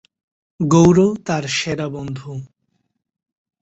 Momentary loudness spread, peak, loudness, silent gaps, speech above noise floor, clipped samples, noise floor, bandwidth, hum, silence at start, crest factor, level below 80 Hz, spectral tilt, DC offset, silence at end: 18 LU; -2 dBFS; -17 LUFS; none; 53 dB; under 0.1%; -70 dBFS; 8.2 kHz; none; 0.6 s; 18 dB; -50 dBFS; -6 dB/octave; under 0.1%; 1.15 s